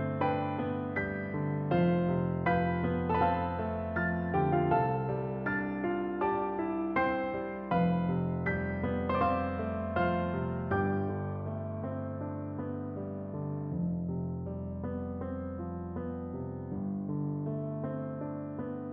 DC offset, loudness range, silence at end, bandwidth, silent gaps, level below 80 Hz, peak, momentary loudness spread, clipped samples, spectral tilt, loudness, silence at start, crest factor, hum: under 0.1%; 7 LU; 0 s; 4.8 kHz; none; -54 dBFS; -16 dBFS; 9 LU; under 0.1%; -11 dB/octave; -33 LUFS; 0 s; 16 dB; none